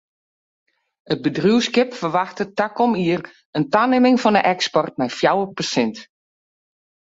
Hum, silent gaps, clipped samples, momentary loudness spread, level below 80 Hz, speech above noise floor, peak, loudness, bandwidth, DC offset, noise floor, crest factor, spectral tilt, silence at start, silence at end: none; 3.45-3.53 s; under 0.1%; 10 LU; -62 dBFS; over 71 dB; -2 dBFS; -19 LUFS; 8 kHz; under 0.1%; under -90 dBFS; 18 dB; -5 dB/octave; 1.1 s; 1.15 s